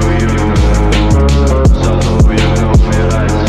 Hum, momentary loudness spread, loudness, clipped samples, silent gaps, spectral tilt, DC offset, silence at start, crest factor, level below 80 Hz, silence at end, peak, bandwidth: none; 2 LU; -11 LUFS; under 0.1%; none; -6.5 dB/octave; under 0.1%; 0 s; 8 dB; -12 dBFS; 0 s; 0 dBFS; 11.5 kHz